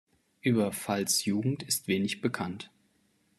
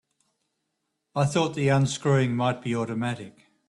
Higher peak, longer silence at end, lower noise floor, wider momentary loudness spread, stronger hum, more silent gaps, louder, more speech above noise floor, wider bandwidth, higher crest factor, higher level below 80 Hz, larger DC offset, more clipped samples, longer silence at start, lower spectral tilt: second, -14 dBFS vs -10 dBFS; first, 0.75 s vs 0.4 s; second, -70 dBFS vs -79 dBFS; about the same, 10 LU vs 10 LU; neither; neither; second, -30 LUFS vs -25 LUFS; second, 40 dB vs 55 dB; first, 13.5 kHz vs 11.5 kHz; about the same, 18 dB vs 16 dB; second, -72 dBFS vs -62 dBFS; neither; neither; second, 0.45 s vs 1.15 s; second, -4 dB/octave vs -6 dB/octave